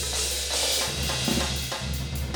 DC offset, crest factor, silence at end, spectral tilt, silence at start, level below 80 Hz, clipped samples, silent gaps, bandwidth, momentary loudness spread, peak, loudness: under 0.1%; 16 dB; 0 s; -2.5 dB/octave; 0 s; -36 dBFS; under 0.1%; none; 19.5 kHz; 7 LU; -12 dBFS; -25 LUFS